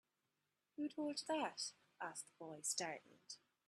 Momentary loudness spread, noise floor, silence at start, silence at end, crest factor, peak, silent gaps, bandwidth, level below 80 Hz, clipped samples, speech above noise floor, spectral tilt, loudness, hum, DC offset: 15 LU; -89 dBFS; 0.8 s; 0.3 s; 24 dB; -24 dBFS; none; 13.5 kHz; under -90 dBFS; under 0.1%; 42 dB; -2 dB/octave; -46 LUFS; none; under 0.1%